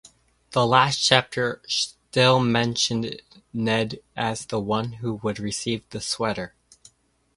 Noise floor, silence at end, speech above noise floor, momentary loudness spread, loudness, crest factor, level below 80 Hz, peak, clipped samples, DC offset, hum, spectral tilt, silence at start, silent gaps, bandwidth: -62 dBFS; 0.9 s; 38 dB; 12 LU; -23 LUFS; 24 dB; -56 dBFS; 0 dBFS; under 0.1%; under 0.1%; none; -4 dB/octave; 0.5 s; none; 11.5 kHz